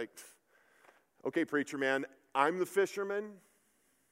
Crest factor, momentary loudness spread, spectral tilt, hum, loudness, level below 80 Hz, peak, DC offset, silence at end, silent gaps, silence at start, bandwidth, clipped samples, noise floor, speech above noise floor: 24 dB; 13 LU; -4.5 dB/octave; none; -34 LUFS; -90 dBFS; -14 dBFS; under 0.1%; 0.75 s; none; 0 s; 16 kHz; under 0.1%; -74 dBFS; 39 dB